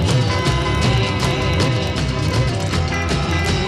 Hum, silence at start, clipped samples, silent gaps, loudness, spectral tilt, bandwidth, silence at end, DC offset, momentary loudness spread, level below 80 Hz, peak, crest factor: none; 0 s; under 0.1%; none; -18 LUFS; -5.5 dB/octave; 13 kHz; 0 s; 0.4%; 3 LU; -28 dBFS; -4 dBFS; 14 dB